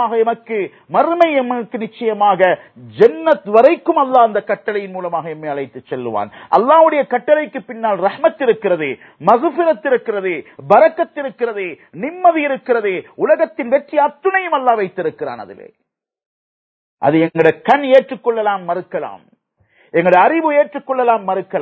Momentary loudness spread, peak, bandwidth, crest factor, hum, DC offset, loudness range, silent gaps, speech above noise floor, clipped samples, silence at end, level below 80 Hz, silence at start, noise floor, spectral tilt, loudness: 13 LU; 0 dBFS; 6.2 kHz; 16 dB; none; under 0.1%; 4 LU; 16.26-16.97 s; 42 dB; under 0.1%; 0 s; -66 dBFS; 0 s; -57 dBFS; -8 dB/octave; -15 LUFS